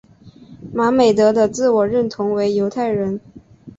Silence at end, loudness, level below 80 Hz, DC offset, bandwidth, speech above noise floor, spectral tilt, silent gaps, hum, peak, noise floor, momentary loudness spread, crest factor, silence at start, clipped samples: 0.1 s; -17 LUFS; -54 dBFS; under 0.1%; 8 kHz; 27 dB; -6 dB/octave; none; none; -2 dBFS; -43 dBFS; 9 LU; 14 dB; 0.25 s; under 0.1%